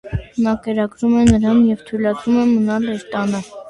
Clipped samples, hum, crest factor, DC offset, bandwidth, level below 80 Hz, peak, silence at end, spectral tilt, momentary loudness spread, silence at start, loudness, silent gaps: under 0.1%; none; 16 dB; under 0.1%; 10.5 kHz; -36 dBFS; 0 dBFS; 0 s; -7 dB/octave; 9 LU; 0.05 s; -17 LUFS; none